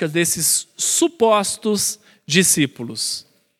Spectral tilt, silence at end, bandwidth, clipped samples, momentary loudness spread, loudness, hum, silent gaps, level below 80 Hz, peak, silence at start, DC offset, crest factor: -2.5 dB/octave; 0.4 s; 18.5 kHz; under 0.1%; 9 LU; -18 LUFS; none; none; -62 dBFS; 0 dBFS; 0 s; under 0.1%; 18 dB